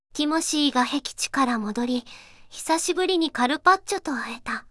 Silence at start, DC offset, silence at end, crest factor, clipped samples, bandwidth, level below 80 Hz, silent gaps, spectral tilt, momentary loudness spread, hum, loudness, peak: 0.15 s; under 0.1%; 0.1 s; 20 dB; under 0.1%; 12 kHz; -58 dBFS; none; -2 dB/octave; 10 LU; none; -24 LUFS; -4 dBFS